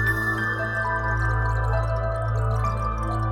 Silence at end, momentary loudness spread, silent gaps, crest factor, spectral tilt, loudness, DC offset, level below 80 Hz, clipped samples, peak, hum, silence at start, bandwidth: 0 s; 3 LU; none; 12 dB; -7 dB/octave; -25 LUFS; under 0.1%; -30 dBFS; under 0.1%; -10 dBFS; none; 0 s; 15.5 kHz